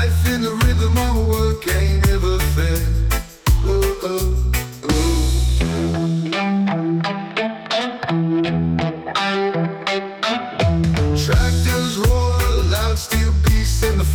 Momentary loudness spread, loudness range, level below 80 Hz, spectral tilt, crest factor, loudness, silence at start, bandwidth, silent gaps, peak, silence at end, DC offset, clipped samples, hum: 5 LU; 3 LU; -22 dBFS; -5.5 dB/octave; 12 dB; -19 LUFS; 0 s; 19.5 kHz; none; -6 dBFS; 0 s; under 0.1%; under 0.1%; none